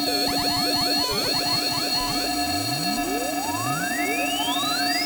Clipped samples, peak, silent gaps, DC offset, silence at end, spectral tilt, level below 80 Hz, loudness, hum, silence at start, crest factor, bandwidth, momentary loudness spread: under 0.1%; -12 dBFS; none; under 0.1%; 0 s; -2 dB/octave; -48 dBFS; -22 LUFS; none; 0 s; 12 dB; over 20 kHz; 4 LU